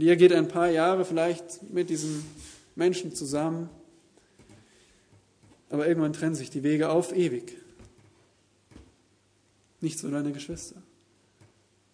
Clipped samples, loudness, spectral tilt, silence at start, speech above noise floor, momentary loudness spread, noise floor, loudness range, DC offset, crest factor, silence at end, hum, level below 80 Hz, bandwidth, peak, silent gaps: under 0.1%; -27 LUFS; -5.5 dB/octave; 0 s; 40 dB; 16 LU; -66 dBFS; 10 LU; under 0.1%; 22 dB; 1.15 s; none; -64 dBFS; 11 kHz; -6 dBFS; none